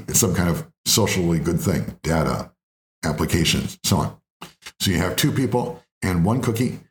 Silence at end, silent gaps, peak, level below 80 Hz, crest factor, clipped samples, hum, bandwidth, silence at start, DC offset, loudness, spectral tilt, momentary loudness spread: 0.1 s; 0.78-0.84 s, 2.63-3.02 s, 4.30-4.40 s, 5.92-6.01 s; -4 dBFS; -42 dBFS; 18 dB; under 0.1%; none; over 20 kHz; 0 s; under 0.1%; -22 LUFS; -4.5 dB/octave; 11 LU